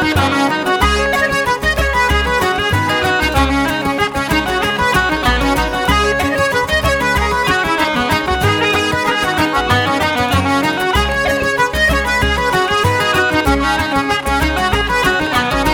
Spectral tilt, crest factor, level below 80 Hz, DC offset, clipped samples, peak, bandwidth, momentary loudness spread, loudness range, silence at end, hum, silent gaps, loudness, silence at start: -4.5 dB/octave; 14 dB; -26 dBFS; under 0.1%; under 0.1%; 0 dBFS; 19 kHz; 2 LU; 1 LU; 0 s; none; none; -14 LUFS; 0 s